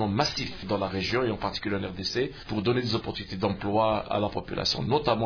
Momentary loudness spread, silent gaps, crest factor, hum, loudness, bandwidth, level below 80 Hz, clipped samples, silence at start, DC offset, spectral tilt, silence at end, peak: 5 LU; none; 18 dB; none; -28 LUFS; 5.4 kHz; -48 dBFS; under 0.1%; 0 s; under 0.1%; -5.5 dB/octave; 0 s; -8 dBFS